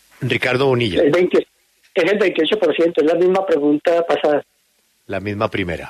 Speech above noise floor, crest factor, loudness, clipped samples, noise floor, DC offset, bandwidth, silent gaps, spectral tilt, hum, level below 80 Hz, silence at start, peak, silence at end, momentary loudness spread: 45 dB; 14 dB; -17 LUFS; under 0.1%; -62 dBFS; under 0.1%; 13 kHz; none; -6.5 dB/octave; none; -52 dBFS; 0.2 s; -4 dBFS; 0 s; 7 LU